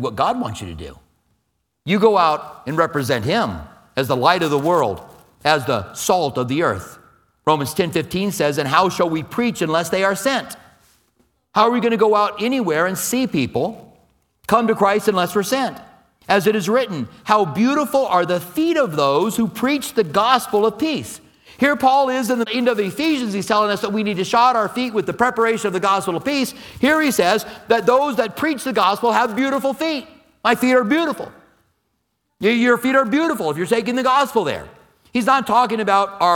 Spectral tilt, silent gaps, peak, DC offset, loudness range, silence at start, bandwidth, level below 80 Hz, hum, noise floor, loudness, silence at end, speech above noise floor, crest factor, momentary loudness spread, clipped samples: -4.5 dB/octave; none; 0 dBFS; under 0.1%; 2 LU; 0 s; 19 kHz; -54 dBFS; none; -71 dBFS; -18 LUFS; 0 s; 53 dB; 18 dB; 9 LU; under 0.1%